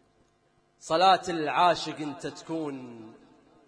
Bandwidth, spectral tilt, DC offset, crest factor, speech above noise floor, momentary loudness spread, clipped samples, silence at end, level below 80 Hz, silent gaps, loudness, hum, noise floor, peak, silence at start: 10.5 kHz; -4 dB/octave; under 0.1%; 20 dB; 40 dB; 22 LU; under 0.1%; 0.55 s; -68 dBFS; none; -26 LUFS; none; -67 dBFS; -8 dBFS; 0.85 s